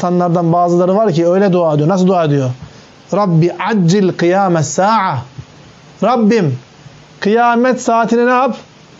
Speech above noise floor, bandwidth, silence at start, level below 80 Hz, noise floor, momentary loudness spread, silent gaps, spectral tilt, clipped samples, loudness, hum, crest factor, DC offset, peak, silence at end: 28 dB; 8 kHz; 0 s; -58 dBFS; -39 dBFS; 8 LU; none; -6.5 dB/octave; under 0.1%; -13 LUFS; none; 10 dB; under 0.1%; -4 dBFS; 0.35 s